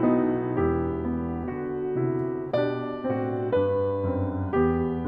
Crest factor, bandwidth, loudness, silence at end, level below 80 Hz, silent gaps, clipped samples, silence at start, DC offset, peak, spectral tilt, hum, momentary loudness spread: 16 dB; 5.2 kHz; -27 LUFS; 0 s; -46 dBFS; none; under 0.1%; 0 s; under 0.1%; -10 dBFS; -11 dB/octave; none; 6 LU